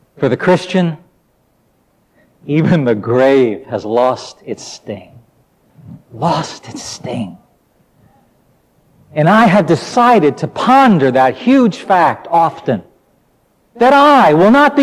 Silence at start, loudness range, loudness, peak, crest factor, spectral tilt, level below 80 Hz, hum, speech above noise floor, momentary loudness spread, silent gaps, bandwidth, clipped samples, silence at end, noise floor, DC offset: 0.2 s; 13 LU; -12 LUFS; 0 dBFS; 12 dB; -6.5 dB/octave; -54 dBFS; none; 45 dB; 18 LU; none; 14.5 kHz; under 0.1%; 0 s; -57 dBFS; under 0.1%